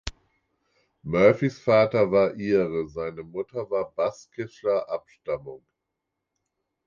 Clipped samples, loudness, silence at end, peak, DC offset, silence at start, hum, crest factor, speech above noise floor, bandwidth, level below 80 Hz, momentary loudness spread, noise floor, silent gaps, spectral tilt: under 0.1%; -25 LUFS; 1.3 s; -4 dBFS; under 0.1%; 0.05 s; none; 22 dB; 58 dB; 7.4 kHz; -54 dBFS; 15 LU; -83 dBFS; none; -7 dB/octave